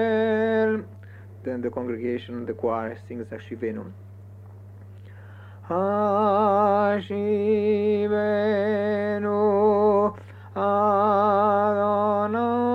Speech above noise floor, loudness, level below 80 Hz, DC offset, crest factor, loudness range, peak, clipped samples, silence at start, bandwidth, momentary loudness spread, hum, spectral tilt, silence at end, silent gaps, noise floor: 20 dB; -23 LUFS; -66 dBFS; under 0.1%; 14 dB; 11 LU; -10 dBFS; under 0.1%; 0 s; 5.8 kHz; 15 LU; none; -8.5 dB/octave; 0 s; none; -43 dBFS